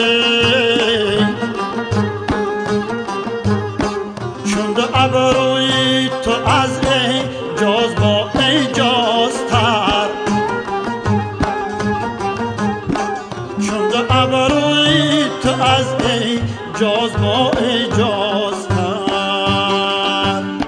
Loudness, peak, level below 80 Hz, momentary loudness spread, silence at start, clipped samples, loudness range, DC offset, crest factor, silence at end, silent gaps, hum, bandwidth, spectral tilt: -16 LUFS; 0 dBFS; -40 dBFS; 7 LU; 0 s; under 0.1%; 5 LU; under 0.1%; 16 dB; 0 s; none; none; 10 kHz; -4.5 dB/octave